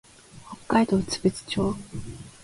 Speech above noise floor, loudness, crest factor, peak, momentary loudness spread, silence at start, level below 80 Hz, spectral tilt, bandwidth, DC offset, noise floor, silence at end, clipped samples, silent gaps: 20 dB; -25 LUFS; 22 dB; -6 dBFS; 20 LU; 0.35 s; -50 dBFS; -5.5 dB/octave; 11.5 kHz; under 0.1%; -45 dBFS; 0.15 s; under 0.1%; none